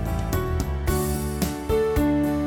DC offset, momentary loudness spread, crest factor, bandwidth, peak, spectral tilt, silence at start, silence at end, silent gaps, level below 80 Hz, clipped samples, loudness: under 0.1%; 5 LU; 14 dB; over 20 kHz; -10 dBFS; -6 dB/octave; 0 s; 0 s; none; -30 dBFS; under 0.1%; -24 LUFS